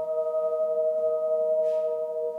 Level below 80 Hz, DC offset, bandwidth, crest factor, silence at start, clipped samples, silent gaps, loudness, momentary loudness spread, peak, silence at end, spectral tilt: -80 dBFS; under 0.1%; 3.3 kHz; 8 dB; 0 s; under 0.1%; none; -26 LUFS; 3 LU; -18 dBFS; 0 s; -6 dB/octave